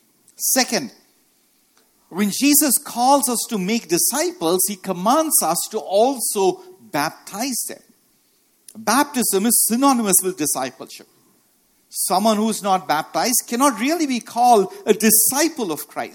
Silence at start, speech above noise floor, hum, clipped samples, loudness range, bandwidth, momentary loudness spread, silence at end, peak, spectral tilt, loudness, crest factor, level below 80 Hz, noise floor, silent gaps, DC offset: 0.4 s; 42 dB; none; under 0.1%; 5 LU; 17.5 kHz; 11 LU; 0.05 s; 0 dBFS; -2.5 dB/octave; -18 LUFS; 20 dB; -68 dBFS; -61 dBFS; none; under 0.1%